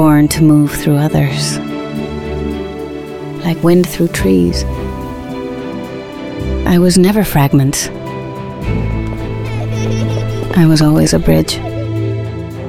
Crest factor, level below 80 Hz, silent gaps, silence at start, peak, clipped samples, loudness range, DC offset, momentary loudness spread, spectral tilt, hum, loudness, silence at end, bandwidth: 12 dB; -28 dBFS; none; 0 s; 0 dBFS; under 0.1%; 3 LU; under 0.1%; 14 LU; -6 dB/octave; none; -14 LUFS; 0 s; 16.5 kHz